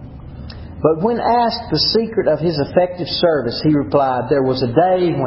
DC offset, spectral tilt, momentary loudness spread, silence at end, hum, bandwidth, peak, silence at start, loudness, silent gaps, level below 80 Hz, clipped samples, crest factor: under 0.1%; -9.5 dB/octave; 7 LU; 0 s; none; 5.8 kHz; 0 dBFS; 0 s; -16 LUFS; none; -40 dBFS; under 0.1%; 16 dB